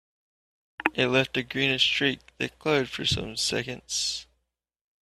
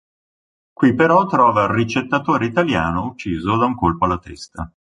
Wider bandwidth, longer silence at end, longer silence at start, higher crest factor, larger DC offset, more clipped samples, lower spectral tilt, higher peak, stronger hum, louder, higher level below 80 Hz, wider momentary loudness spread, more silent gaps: first, 14.5 kHz vs 10.5 kHz; first, 0.85 s vs 0.3 s; about the same, 0.8 s vs 0.8 s; first, 26 dB vs 16 dB; neither; neither; second, -3 dB/octave vs -7 dB/octave; about the same, -2 dBFS vs -2 dBFS; neither; second, -26 LUFS vs -17 LUFS; second, -56 dBFS vs -40 dBFS; second, 9 LU vs 12 LU; neither